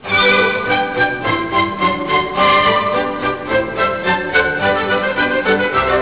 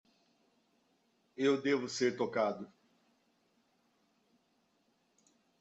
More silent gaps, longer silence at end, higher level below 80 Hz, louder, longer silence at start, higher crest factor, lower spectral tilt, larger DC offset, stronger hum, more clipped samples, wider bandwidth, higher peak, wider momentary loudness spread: neither; second, 0 s vs 2.95 s; first, -42 dBFS vs -84 dBFS; first, -15 LUFS vs -34 LUFS; second, 0 s vs 1.4 s; second, 12 dB vs 20 dB; first, -8 dB/octave vs -4.5 dB/octave; first, 0.5% vs under 0.1%; neither; neither; second, 4 kHz vs 8.2 kHz; first, -4 dBFS vs -20 dBFS; second, 6 LU vs 17 LU